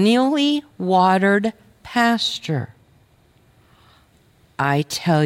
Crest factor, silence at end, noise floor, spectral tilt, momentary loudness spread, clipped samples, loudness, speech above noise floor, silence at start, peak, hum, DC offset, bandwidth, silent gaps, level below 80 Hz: 16 dB; 0 s; -56 dBFS; -5.5 dB/octave; 11 LU; under 0.1%; -19 LUFS; 38 dB; 0 s; -4 dBFS; none; under 0.1%; 16.5 kHz; none; -60 dBFS